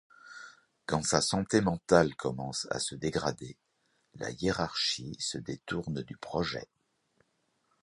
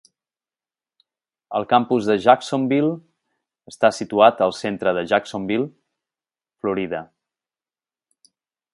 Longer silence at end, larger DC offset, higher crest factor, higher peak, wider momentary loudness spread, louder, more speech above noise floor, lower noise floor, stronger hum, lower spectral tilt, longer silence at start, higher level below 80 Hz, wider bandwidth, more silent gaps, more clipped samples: second, 1.2 s vs 1.7 s; neither; about the same, 26 dB vs 22 dB; second, -6 dBFS vs 0 dBFS; first, 20 LU vs 12 LU; second, -31 LUFS vs -20 LUFS; second, 44 dB vs over 71 dB; second, -76 dBFS vs under -90 dBFS; neither; second, -4 dB/octave vs -5.5 dB/octave; second, 0.25 s vs 1.5 s; first, -56 dBFS vs -64 dBFS; about the same, 11.5 kHz vs 11.5 kHz; neither; neither